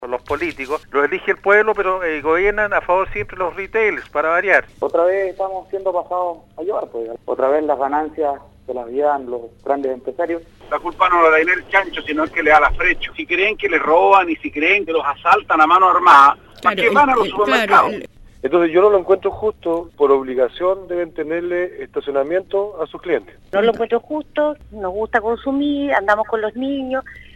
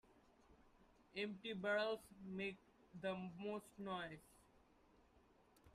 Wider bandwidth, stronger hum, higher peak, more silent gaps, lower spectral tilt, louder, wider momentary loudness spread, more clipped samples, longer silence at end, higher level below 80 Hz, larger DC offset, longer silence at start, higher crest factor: about the same, 13 kHz vs 14 kHz; neither; first, -2 dBFS vs -30 dBFS; neither; about the same, -5 dB/octave vs -5.5 dB/octave; first, -17 LUFS vs -47 LUFS; about the same, 12 LU vs 12 LU; neither; about the same, 0.15 s vs 0.05 s; first, -42 dBFS vs -78 dBFS; neither; about the same, 0 s vs 0.1 s; about the same, 16 dB vs 20 dB